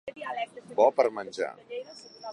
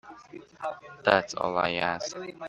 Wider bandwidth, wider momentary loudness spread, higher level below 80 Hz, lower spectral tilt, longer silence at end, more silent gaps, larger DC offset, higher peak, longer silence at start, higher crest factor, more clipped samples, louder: first, 11 kHz vs 9.6 kHz; second, 18 LU vs 22 LU; second, -80 dBFS vs -66 dBFS; about the same, -4 dB/octave vs -3.5 dB/octave; about the same, 0 s vs 0 s; neither; neither; second, -8 dBFS vs -2 dBFS; about the same, 0.05 s vs 0.05 s; second, 22 dB vs 28 dB; neither; about the same, -28 LUFS vs -28 LUFS